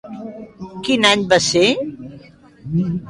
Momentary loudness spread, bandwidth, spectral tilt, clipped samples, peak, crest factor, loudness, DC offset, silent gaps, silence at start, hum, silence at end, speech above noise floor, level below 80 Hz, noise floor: 22 LU; 11.5 kHz; -4 dB/octave; under 0.1%; -2 dBFS; 18 dB; -16 LUFS; under 0.1%; none; 0.05 s; none; 0 s; 26 dB; -50 dBFS; -43 dBFS